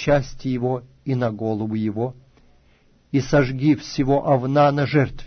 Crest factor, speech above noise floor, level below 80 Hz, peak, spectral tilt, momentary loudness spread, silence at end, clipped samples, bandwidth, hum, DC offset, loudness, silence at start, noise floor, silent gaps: 16 dB; 36 dB; -42 dBFS; -4 dBFS; -7.5 dB/octave; 9 LU; 0 s; under 0.1%; 6.6 kHz; none; under 0.1%; -21 LUFS; 0 s; -57 dBFS; none